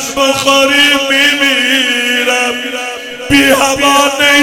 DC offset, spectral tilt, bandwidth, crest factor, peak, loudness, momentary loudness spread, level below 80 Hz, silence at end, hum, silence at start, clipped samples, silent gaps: under 0.1%; -1.5 dB/octave; 17.5 kHz; 10 dB; 0 dBFS; -9 LUFS; 10 LU; -42 dBFS; 0 s; none; 0 s; 0.5%; none